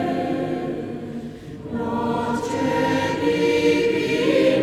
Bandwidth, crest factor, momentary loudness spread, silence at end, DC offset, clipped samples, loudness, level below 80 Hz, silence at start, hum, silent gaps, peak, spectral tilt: 14.5 kHz; 14 dB; 13 LU; 0 s; under 0.1%; under 0.1%; -22 LUFS; -52 dBFS; 0 s; none; none; -8 dBFS; -5.5 dB/octave